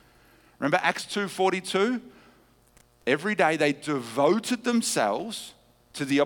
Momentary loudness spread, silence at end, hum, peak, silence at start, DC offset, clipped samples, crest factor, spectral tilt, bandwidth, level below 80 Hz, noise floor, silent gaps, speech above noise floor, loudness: 11 LU; 0 s; none; -6 dBFS; 0.6 s; under 0.1%; under 0.1%; 20 dB; -4 dB/octave; 19 kHz; -68 dBFS; -60 dBFS; none; 34 dB; -26 LUFS